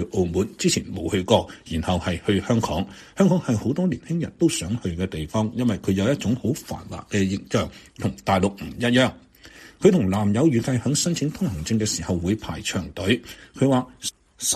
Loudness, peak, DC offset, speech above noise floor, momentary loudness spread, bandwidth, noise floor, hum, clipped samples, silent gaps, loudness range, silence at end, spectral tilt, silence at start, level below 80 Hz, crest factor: -23 LUFS; -2 dBFS; under 0.1%; 24 dB; 9 LU; 14.5 kHz; -47 dBFS; none; under 0.1%; none; 3 LU; 0 s; -5 dB/octave; 0 s; -46 dBFS; 20 dB